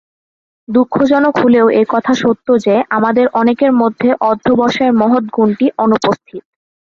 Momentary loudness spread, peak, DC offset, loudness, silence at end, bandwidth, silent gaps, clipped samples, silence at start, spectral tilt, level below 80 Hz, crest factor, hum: 4 LU; 0 dBFS; under 0.1%; -12 LUFS; 0.45 s; 7.2 kHz; none; under 0.1%; 0.7 s; -6.5 dB/octave; -52 dBFS; 12 dB; none